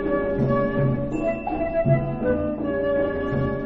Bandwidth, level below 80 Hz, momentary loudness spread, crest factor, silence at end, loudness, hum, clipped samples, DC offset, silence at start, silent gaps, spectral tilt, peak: 7.6 kHz; -38 dBFS; 4 LU; 16 dB; 0 s; -23 LUFS; none; under 0.1%; under 0.1%; 0 s; none; -10 dB/octave; -8 dBFS